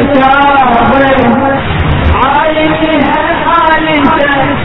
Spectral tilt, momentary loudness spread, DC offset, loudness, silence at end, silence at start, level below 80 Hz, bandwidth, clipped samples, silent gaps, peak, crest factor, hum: -8.5 dB/octave; 4 LU; under 0.1%; -8 LUFS; 0 s; 0 s; -24 dBFS; 6 kHz; 0.5%; none; 0 dBFS; 8 dB; none